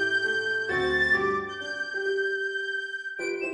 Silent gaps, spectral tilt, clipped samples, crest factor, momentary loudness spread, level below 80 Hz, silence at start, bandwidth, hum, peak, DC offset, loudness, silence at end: none; -3.5 dB/octave; under 0.1%; 14 dB; 9 LU; -56 dBFS; 0 s; 10 kHz; none; -14 dBFS; under 0.1%; -27 LUFS; 0 s